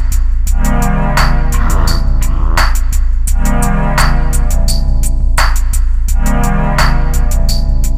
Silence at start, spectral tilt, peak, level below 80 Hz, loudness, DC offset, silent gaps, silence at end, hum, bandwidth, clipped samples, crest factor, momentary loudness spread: 0 s; -4.5 dB/octave; 0 dBFS; -10 dBFS; -14 LUFS; under 0.1%; none; 0 s; none; 15.5 kHz; under 0.1%; 8 dB; 4 LU